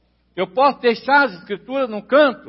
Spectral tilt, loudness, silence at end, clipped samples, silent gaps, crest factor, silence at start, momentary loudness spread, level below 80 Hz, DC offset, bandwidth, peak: -8.5 dB/octave; -18 LUFS; 0 s; under 0.1%; none; 16 dB; 0.35 s; 11 LU; -64 dBFS; under 0.1%; 5.8 kHz; -4 dBFS